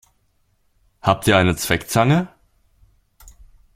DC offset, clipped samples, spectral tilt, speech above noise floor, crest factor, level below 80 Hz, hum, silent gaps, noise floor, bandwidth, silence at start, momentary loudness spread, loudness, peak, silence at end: under 0.1%; under 0.1%; -5 dB/octave; 47 dB; 22 dB; -46 dBFS; none; none; -64 dBFS; 16.5 kHz; 1.05 s; 7 LU; -18 LUFS; 0 dBFS; 1.5 s